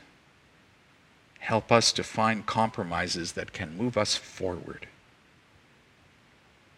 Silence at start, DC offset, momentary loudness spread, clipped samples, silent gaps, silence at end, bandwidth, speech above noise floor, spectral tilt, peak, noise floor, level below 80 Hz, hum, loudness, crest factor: 1.4 s; under 0.1%; 17 LU; under 0.1%; none; 1.9 s; 14 kHz; 32 dB; -3.5 dB/octave; -4 dBFS; -60 dBFS; -60 dBFS; none; -28 LUFS; 28 dB